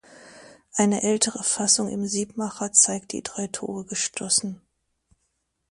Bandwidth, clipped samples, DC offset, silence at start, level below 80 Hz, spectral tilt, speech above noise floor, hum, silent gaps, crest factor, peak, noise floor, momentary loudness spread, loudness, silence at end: 11.5 kHz; under 0.1%; under 0.1%; 0.1 s; -64 dBFS; -2.5 dB/octave; 50 dB; none; none; 24 dB; -4 dBFS; -75 dBFS; 13 LU; -23 LUFS; 1.15 s